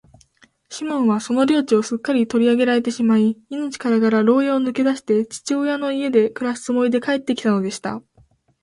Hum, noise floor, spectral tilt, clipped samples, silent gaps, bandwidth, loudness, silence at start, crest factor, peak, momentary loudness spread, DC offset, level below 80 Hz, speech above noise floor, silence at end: none; -56 dBFS; -5.5 dB/octave; under 0.1%; none; 11.5 kHz; -19 LUFS; 0.7 s; 16 dB; -4 dBFS; 9 LU; under 0.1%; -64 dBFS; 38 dB; 0.65 s